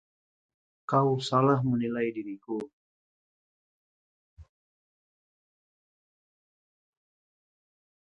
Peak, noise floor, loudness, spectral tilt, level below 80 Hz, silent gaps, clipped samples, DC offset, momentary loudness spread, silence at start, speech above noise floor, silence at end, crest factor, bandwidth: -10 dBFS; under -90 dBFS; -28 LUFS; -7.5 dB/octave; -68 dBFS; 2.73-4.37 s; under 0.1%; under 0.1%; 14 LU; 0.9 s; over 63 dB; 3.65 s; 24 dB; 9.2 kHz